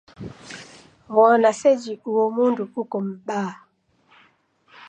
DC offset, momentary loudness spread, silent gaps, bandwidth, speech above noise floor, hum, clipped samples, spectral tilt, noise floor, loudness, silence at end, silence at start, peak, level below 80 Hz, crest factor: under 0.1%; 23 LU; none; 9.6 kHz; 40 dB; none; under 0.1%; -5.5 dB/octave; -60 dBFS; -21 LUFS; 1.35 s; 0.2 s; -4 dBFS; -64 dBFS; 20 dB